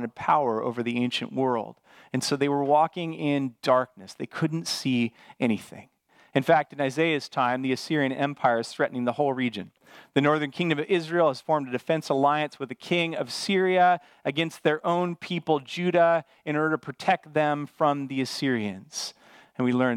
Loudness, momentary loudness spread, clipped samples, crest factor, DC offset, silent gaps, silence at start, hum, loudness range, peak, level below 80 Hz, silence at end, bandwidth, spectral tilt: -26 LUFS; 9 LU; under 0.1%; 20 dB; under 0.1%; none; 0 s; none; 3 LU; -6 dBFS; -76 dBFS; 0 s; 15.5 kHz; -5.5 dB/octave